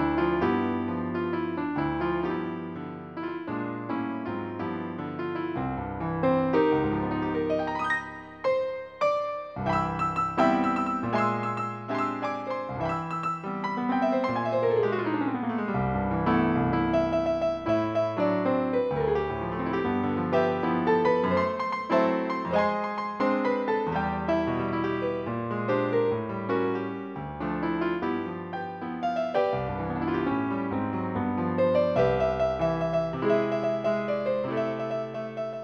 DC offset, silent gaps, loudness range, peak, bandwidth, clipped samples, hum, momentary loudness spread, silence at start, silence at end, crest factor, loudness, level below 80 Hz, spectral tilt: under 0.1%; none; 4 LU; -10 dBFS; 8.4 kHz; under 0.1%; none; 8 LU; 0 s; 0 s; 18 dB; -28 LUFS; -50 dBFS; -8 dB/octave